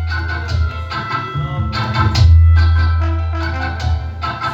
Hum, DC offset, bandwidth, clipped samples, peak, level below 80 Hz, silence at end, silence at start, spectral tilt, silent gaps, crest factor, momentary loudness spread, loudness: none; under 0.1%; 7.2 kHz; under 0.1%; 0 dBFS; -22 dBFS; 0 s; 0 s; -6.5 dB/octave; none; 14 dB; 11 LU; -16 LUFS